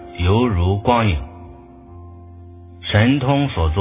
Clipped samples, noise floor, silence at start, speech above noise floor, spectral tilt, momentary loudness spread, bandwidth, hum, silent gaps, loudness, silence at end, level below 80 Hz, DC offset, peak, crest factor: under 0.1%; -40 dBFS; 0 s; 24 dB; -11 dB/octave; 18 LU; 3.8 kHz; none; none; -17 LUFS; 0 s; -28 dBFS; under 0.1%; 0 dBFS; 18 dB